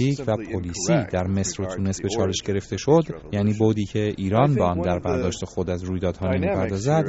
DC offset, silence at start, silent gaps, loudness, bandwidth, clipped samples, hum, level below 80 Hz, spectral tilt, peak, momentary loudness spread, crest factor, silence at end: under 0.1%; 0 s; none; -23 LUFS; 8 kHz; under 0.1%; none; -46 dBFS; -6.5 dB/octave; -4 dBFS; 7 LU; 18 dB; 0 s